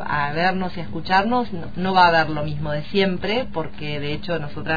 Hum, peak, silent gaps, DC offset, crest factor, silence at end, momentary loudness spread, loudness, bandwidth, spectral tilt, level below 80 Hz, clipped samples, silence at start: none; -2 dBFS; none; 4%; 20 dB; 0 s; 12 LU; -22 LUFS; 5 kHz; -7 dB/octave; -44 dBFS; under 0.1%; 0 s